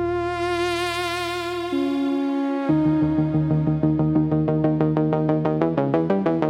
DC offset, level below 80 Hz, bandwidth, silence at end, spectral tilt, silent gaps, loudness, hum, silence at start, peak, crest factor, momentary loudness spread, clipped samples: under 0.1%; -48 dBFS; 13 kHz; 0 s; -7.5 dB/octave; none; -22 LUFS; none; 0 s; -6 dBFS; 16 dB; 4 LU; under 0.1%